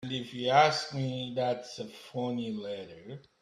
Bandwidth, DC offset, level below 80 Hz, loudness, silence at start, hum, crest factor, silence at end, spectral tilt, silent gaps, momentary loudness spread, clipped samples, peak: 13 kHz; under 0.1%; -72 dBFS; -31 LUFS; 0 s; none; 22 dB; 0.2 s; -5 dB/octave; none; 18 LU; under 0.1%; -10 dBFS